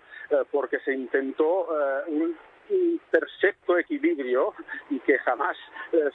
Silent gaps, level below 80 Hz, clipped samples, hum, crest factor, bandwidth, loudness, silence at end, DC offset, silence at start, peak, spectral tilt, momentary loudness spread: none; -76 dBFS; under 0.1%; none; 20 dB; 4.1 kHz; -26 LUFS; 0.05 s; under 0.1%; 0.1 s; -6 dBFS; -6 dB/octave; 6 LU